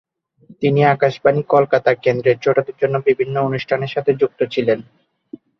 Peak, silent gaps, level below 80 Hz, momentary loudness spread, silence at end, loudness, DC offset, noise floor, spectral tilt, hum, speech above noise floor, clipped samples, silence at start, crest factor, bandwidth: -2 dBFS; none; -58 dBFS; 6 LU; 0.8 s; -17 LUFS; under 0.1%; -48 dBFS; -8 dB/octave; none; 32 dB; under 0.1%; 0.5 s; 16 dB; 6.4 kHz